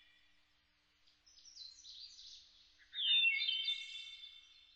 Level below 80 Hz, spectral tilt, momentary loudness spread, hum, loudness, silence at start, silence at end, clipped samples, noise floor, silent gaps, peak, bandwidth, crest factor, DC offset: -82 dBFS; 4 dB/octave; 25 LU; none; -34 LUFS; 1.45 s; 0.35 s; under 0.1%; -76 dBFS; none; -24 dBFS; 8.8 kHz; 18 dB; under 0.1%